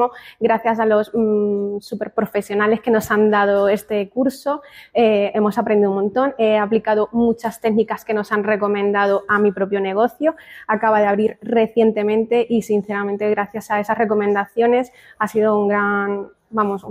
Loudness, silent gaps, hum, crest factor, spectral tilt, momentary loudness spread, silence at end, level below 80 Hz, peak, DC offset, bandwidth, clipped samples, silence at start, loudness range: -18 LUFS; none; none; 12 dB; -6.5 dB/octave; 7 LU; 0 s; -58 dBFS; -6 dBFS; under 0.1%; 15.5 kHz; under 0.1%; 0 s; 1 LU